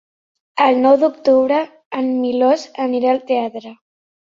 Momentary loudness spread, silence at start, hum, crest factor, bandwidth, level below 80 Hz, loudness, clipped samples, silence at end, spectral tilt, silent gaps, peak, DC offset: 12 LU; 0.55 s; none; 16 dB; 7.4 kHz; -66 dBFS; -16 LUFS; under 0.1%; 0.6 s; -5 dB/octave; 1.86-1.91 s; -2 dBFS; under 0.1%